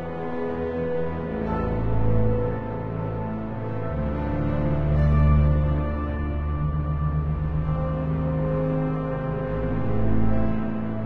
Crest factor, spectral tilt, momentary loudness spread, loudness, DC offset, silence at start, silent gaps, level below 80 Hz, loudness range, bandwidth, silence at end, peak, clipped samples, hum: 14 dB; -11 dB/octave; 8 LU; -26 LUFS; under 0.1%; 0 s; none; -30 dBFS; 3 LU; 4.3 kHz; 0 s; -10 dBFS; under 0.1%; none